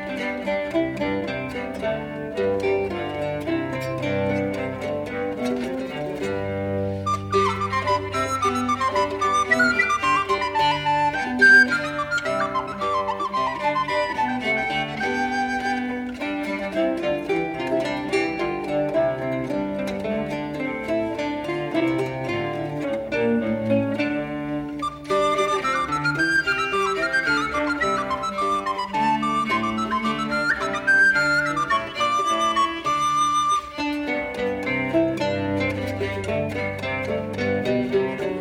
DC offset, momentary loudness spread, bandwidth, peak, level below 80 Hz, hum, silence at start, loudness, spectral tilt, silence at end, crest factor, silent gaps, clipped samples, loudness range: under 0.1%; 8 LU; 17 kHz; -6 dBFS; -50 dBFS; none; 0 s; -23 LUFS; -4.5 dB/octave; 0 s; 18 dB; none; under 0.1%; 6 LU